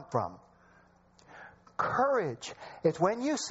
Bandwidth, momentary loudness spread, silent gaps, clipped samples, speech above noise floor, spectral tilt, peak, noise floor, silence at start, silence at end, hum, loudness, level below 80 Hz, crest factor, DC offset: 8 kHz; 21 LU; none; under 0.1%; 32 dB; -4.5 dB/octave; -12 dBFS; -62 dBFS; 0 s; 0 s; none; -31 LUFS; -68 dBFS; 20 dB; under 0.1%